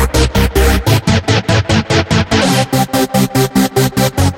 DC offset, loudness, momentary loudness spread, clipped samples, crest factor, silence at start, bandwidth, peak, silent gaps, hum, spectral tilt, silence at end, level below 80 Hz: under 0.1%; -12 LUFS; 1 LU; under 0.1%; 12 dB; 0 s; 16.5 kHz; 0 dBFS; none; none; -5 dB/octave; 0 s; -20 dBFS